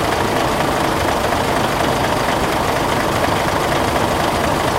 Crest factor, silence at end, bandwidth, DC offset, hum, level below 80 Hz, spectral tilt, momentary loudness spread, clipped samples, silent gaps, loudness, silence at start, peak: 14 dB; 0 s; 16 kHz; under 0.1%; none; -34 dBFS; -4.5 dB/octave; 0 LU; under 0.1%; none; -17 LUFS; 0 s; -2 dBFS